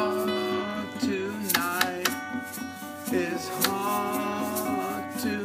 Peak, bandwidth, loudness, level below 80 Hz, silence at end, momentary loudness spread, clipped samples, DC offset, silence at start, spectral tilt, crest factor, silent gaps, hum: -4 dBFS; 15.5 kHz; -28 LUFS; -72 dBFS; 0 s; 9 LU; under 0.1%; under 0.1%; 0 s; -3 dB/octave; 26 dB; none; none